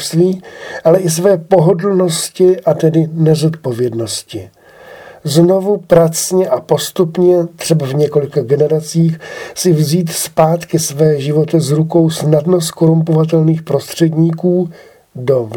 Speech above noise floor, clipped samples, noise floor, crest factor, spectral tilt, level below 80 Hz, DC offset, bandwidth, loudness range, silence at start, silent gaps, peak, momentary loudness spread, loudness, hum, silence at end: 24 dB; under 0.1%; -36 dBFS; 12 dB; -6 dB/octave; -54 dBFS; under 0.1%; 19.5 kHz; 2 LU; 0 s; none; 0 dBFS; 7 LU; -13 LUFS; none; 0 s